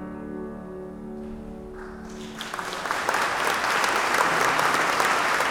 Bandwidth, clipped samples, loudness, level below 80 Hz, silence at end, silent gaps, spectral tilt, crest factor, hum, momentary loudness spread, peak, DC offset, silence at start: 18 kHz; under 0.1%; -23 LUFS; -52 dBFS; 0 s; none; -2 dB/octave; 20 dB; none; 17 LU; -6 dBFS; under 0.1%; 0 s